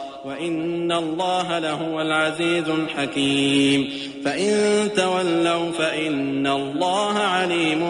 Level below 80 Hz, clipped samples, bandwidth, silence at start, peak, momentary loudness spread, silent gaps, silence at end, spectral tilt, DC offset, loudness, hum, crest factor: -62 dBFS; under 0.1%; 11.5 kHz; 0 s; -8 dBFS; 6 LU; none; 0 s; -4 dB/octave; under 0.1%; -21 LUFS; none; 14 dB